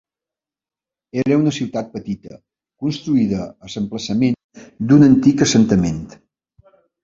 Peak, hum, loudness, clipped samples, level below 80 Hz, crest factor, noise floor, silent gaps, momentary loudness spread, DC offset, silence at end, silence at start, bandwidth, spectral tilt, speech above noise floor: -2 dBFS; none; -17 LUFS; under 0.1%; -48 dBFS; 16 dB; -90 dBFS; 4.44-4.49 s; 16 LU; under 0.1%; 0.95 s; 1.15 s; 7.8 kHz; -6 dB/octave; 74 dB